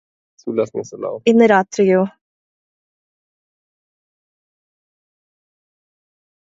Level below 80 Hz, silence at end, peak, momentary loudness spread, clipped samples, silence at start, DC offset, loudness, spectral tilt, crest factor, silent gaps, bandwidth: -66 dBFS; 4.4 s; 0 dBFS; 14 LU; under 0.1%; 0.45 s; under 0.1%; -17 LUFS; -6 dB/octave; 20 dB; none; 7.8 kHz